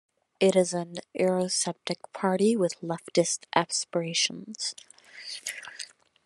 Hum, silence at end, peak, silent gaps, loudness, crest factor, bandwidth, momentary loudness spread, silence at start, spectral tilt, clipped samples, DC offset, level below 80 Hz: none; 0.4 s; -4 dBFS; none; -28 LUFS; 24 dB; 12.5 kHz; 14 LU; 0.4 s; -3.5 dB/octave; under 0.1%; under 0.1%; -78 dBFS